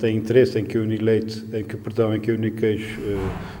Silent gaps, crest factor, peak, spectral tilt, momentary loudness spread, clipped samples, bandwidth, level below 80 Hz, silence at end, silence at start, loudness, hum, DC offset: none; 18 dB; -4 dBFS; -7.5 dB/octave; 11 LU; under 0.1%; 16.5 kHz; -46 dBFS; 0 s; 0 s; -23 LUFS; none; under 0.1%